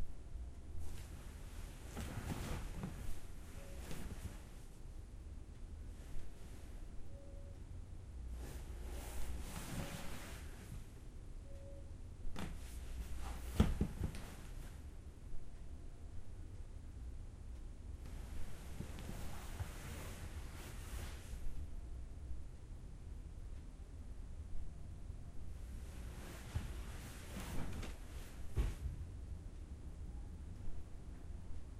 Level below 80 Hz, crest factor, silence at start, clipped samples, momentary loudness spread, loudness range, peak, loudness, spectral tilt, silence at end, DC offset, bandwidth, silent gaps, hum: -48 dBFS; 28 dB; 0 s; under 0.1%; 9 LU; 9 LU; -16 dBFS; -50 LUFS; -5.5 dB/octave; 0 s; under 0.1%; 16 kHz; none; none